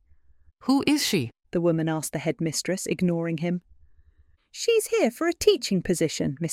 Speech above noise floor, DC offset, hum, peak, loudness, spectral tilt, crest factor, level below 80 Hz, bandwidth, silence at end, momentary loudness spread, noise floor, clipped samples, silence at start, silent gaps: 35 dB; under 0.1%; none; -6 dBFS; -25 LUFS; -4.5 dB/octave; 20 dB; -56 dBFS; 16.5 kHz; 0 s; 7 LU; -60 dBFS; under 0.1%; 0.65 s; none